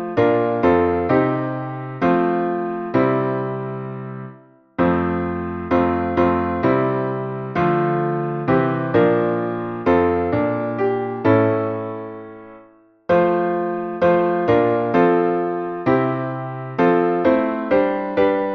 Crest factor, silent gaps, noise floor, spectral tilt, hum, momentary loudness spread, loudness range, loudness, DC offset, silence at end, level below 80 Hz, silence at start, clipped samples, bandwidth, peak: 16 dB; none; -50 dBFS; -9.5 dB/octave; none; 10 LU; 3 LU; -19 LUFS; under 0.1%; 0 s; -48 dBFS; 0 s; under 0.1%; 6 kHz; -2 dBFS